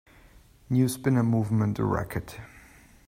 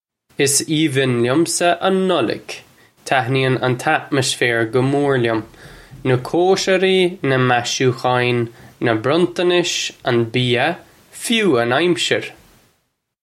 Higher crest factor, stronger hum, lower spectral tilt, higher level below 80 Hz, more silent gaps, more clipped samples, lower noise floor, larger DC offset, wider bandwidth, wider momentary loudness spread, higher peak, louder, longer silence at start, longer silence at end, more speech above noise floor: about the same, 16 dB vs 18 dB; neither; first, -7.5 dB/octave vs -4.5 dB/octave; about the same, -52 dBFS vs -56 dBFS; neither; neither; second, -55 dBFS vs -68 dBFS; neither; about the same, 16 kHz vs 15.5 kHz; first, 13 LU vs 7 LU; second, -12 dBFS vs 0 dBFS; second, -26 LUFS vs -17 LUFS; first, 0.7 s vs 0.4 s; second, 0.6 s vs 0.9 s; second, 29 dB vs 51 dB